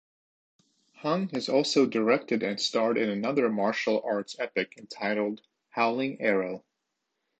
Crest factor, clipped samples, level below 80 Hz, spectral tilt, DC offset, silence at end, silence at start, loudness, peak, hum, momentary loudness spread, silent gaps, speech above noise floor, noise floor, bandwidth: 18 dB; under 0.1%; -78 dBFS; -4.5 dB/octave; under 0.1%; 0.8 s; 1 s; -28 LUFS; -10 dBFS; none; 10 LU; none; 54 dB; -82 dBFS; 8.8 kHz